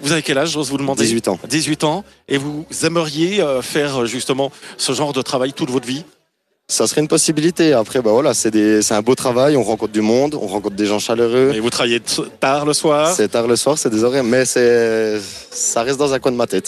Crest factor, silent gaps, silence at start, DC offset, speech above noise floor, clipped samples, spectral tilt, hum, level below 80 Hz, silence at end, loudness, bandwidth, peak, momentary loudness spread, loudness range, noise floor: 14 dB; none; 0 s; under 0.1%; 50 dB; under 0.1%; -3.5 dB/octave; none; -56 dBFS; 0 s; -16 LUFS; 14 kHz; -2 dBFS; 7 LU; 4 LU; -66 dBFS